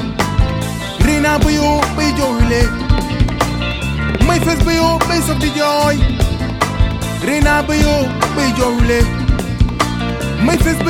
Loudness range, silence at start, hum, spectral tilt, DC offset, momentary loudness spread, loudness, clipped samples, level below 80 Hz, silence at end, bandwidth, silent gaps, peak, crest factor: 0 LU; 0 s; none; -5.5 dB/octave; under 0.1%; 5 LU; -15 LUFS; under 0.1%; -20 dBFS; 0 s; 17.5 kHz; none; 0 dBFS; 14 dB